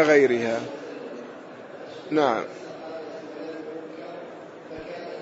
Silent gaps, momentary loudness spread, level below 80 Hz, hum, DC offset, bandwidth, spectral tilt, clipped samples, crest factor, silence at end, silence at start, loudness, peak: none; 18 LU; -70 dBFS; none; under 0.1%; 8 kHz; -5 dB/octave; under 0.1%; 22 dB; 0 s; 0 s; -27 LUFS; -6 dBFS